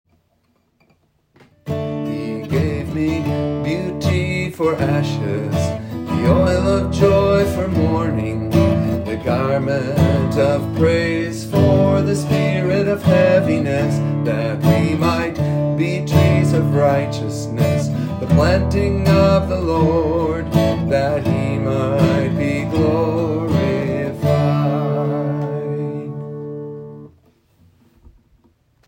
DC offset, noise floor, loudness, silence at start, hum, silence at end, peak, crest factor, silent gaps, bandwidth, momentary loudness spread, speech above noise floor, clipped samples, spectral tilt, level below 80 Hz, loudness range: under 0.1%; -62 dBFS; -18 LUFS; 1.65 s; none; 1.8 s; 0 dBFS; 16 dB; none; 16.5 kHz; 9 LU; 47 dB; under 0.1%; -7.5 dB/octave; -40 dBFS; 6 LU